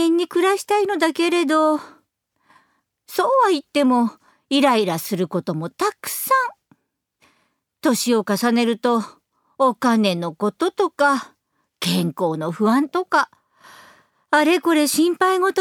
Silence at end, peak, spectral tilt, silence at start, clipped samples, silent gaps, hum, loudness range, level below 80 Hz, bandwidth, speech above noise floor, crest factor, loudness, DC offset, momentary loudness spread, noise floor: 0 s; -4 dBFS; -4.5 dB/octave; 0 s; under 0.1%; none; none; 3 LU; -72 dBFS; 20 kHz; 50 dB; 16 dB; -19 LUFS; under 0.1%; 7 LU; -68 dBFS